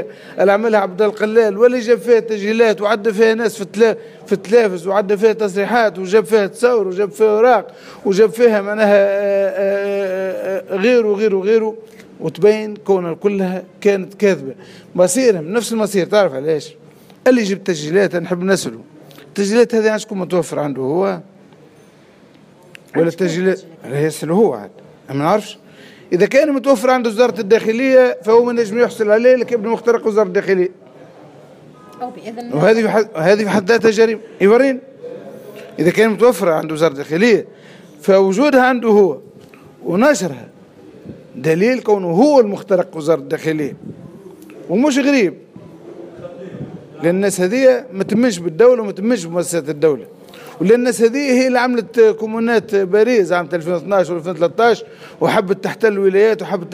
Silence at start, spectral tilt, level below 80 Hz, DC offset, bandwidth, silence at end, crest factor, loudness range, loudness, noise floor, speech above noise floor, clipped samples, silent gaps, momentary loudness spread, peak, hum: 0 s; -5.5 dB/octave; -66 dBFS; under 0.1%; 15.5 kHz; 0 s; 14 dB; 5 LU; -15 LUFS; -46 dBFS; 31 dB; under 0.1%; none; 13 LU; 0 dBFS; none